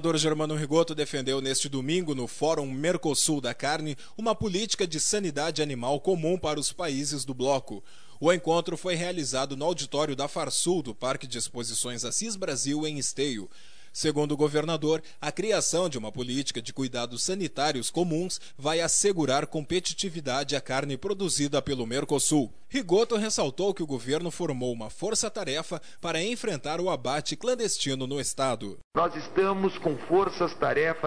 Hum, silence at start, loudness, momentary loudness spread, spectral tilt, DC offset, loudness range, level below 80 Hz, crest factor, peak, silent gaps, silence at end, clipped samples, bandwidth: none; 0 s; -28 LUFS; 7 LU; -3.5 dB/octave; 0.9%; 2 LU; -60 dBFS; 18 dB; -10 dBFS; 28.84-28.91 s; 0 s; under 0.1%; 11 kHz